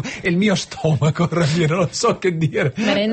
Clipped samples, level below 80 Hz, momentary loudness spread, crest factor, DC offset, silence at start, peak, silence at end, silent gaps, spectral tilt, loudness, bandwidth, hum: under 0.1%; -50 dBFS; 3 LU; 12 dB; under 0.1%; 0 s; -6 dBFS; 0 s; none; -5.5 dB/octave; -19 LUFS; 8.8 kHz; none